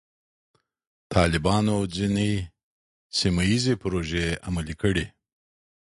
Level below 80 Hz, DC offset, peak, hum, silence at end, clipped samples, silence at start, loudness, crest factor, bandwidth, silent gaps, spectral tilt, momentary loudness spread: -40 dBFS; under 0.1%; -6 dBFS; none; 0.9 s; under 0.1%; 1.1 s; -25 LUFS; 20 dB; 11.5 kHz; 2.63-3.10 s; -5.5 dB/octave; 8 LU